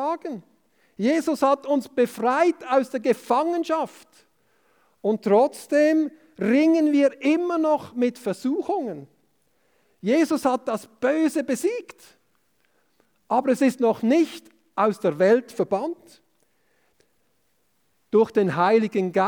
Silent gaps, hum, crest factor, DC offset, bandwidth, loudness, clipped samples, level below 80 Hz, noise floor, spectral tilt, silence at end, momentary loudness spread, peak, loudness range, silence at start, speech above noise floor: none; none; 16 dB; under 0.1%; 20 kHz; -22 LUFS; under 0.1%; -74 dBFS; -70 dBFS; -6 dB/octave; 0 s; 10 LU; -8 dBFS; 5 LU; 0 s; 48 dB